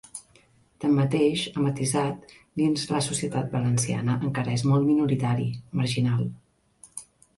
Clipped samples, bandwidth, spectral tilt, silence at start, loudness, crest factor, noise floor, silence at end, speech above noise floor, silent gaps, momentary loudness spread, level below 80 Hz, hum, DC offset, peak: under 0.1%; 11.5 kHz; -5.5 dB/octave; 0.15 s; -25 LUFS; 14 dB; -60 dBFS; 0.35 s; 35 dB; none; 17 LU; -58 dBFS; none; under 0.1%; -12 dBFS